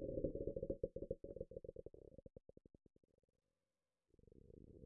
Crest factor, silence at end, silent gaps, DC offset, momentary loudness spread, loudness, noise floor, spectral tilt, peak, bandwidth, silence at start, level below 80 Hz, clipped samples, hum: 22 dB; 0 s; none; under 0.1%; 20 LU; -49 LUFS; under -90 dBFS; -11.5 dB/octave; -28 dBFS; 1.4 kHz; 0 s; -62 dBFS; under 0.1%; none